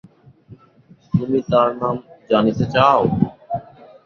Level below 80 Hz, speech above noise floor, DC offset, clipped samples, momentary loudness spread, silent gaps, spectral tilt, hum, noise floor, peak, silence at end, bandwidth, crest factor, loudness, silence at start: -48 dBFS; 34 dB; under 0.1%; under 0.1%; 15 LU; none; -8 dB/octave; none; -50 dBFS; -2 dBFS; 0.45 s; 7 kHz; 18 dB; -19 LUFS; 0.5 s